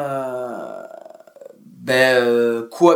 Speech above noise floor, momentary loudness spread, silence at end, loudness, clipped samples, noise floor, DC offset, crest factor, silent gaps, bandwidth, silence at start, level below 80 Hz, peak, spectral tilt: 28 dB; 21 LU; 0 s; -18 LUFS; under 0.1%; -43 dBFS; under 0.1%; 20 dB; none; 18 kHz; 0 s; -70 dBFS; 0 dBFS; -4.5 dB/octave